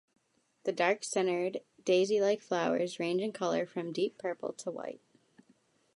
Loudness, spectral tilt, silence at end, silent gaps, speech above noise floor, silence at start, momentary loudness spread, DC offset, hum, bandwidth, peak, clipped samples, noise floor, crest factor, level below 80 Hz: -32 LUFS; -4.5 dB/octave; 1 s; none; 37 dB; 0.65 s; 11 LU; under 0.1%; none; 11.5 kHz; -14 dBFS; under 0.1%; -69 dBFS; 18 dB; -86 dBFS